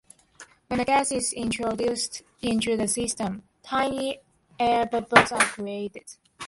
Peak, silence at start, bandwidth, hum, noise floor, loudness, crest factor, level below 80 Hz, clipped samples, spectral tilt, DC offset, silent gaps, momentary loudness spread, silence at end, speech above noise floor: 0 dBFS; 0.4 s; 12 kHz; none; -52 dBFS; -25 LUFS; 26 dB; -56 dBFS; under 0.1%; -3 dB/octave; under 0.1%; none; 13 LU; 0 s; 27 dB